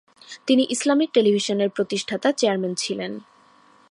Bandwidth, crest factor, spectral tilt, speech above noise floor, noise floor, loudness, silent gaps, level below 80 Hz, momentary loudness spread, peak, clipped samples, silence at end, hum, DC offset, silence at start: 11.5 kHz; 16 dB; -4 dB/octave; 33 dB; -55 dBFS; -22 LUFS; none; -74 dBFS; 13 LU; -6 dBFS; under 0.1%; 0.7 s; none; under 0.1%; 0.3 s